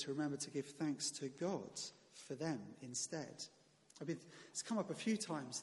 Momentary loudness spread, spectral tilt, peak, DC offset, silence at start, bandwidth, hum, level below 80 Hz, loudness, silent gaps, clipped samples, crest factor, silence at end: 10 LU; -4 dB/octave; -28 dBFS; under 0.1%; 0 s; 11.5 kHz; none; -86 dBFS; -44 LUFS; none; under 0.1%; 16 dB; 0 s